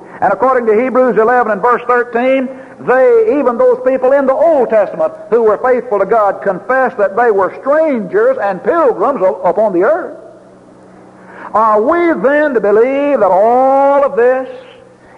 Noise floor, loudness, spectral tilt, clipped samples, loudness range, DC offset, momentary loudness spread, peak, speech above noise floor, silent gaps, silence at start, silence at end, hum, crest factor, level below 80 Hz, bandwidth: -39 dBFS; -11 LUFS; -7.5 dB/octave; under 0.1%; 3 LU; under 0.1%; 6 LU; -2 dBFS; 28 dB; none; 0 s; 0.6 s; none; 10 dB; -54 dBFS; 7.2 kHz